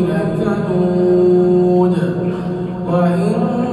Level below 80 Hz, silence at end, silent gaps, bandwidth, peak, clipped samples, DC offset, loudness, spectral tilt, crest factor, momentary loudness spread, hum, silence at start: -44 dBFS; 0 s; none; 10 kHz; -2 dBFS; under 0.1%; under 0.1%; -15 LUFS; -9.5 dB/octave; 12 dB; 8 LU; none; 0 s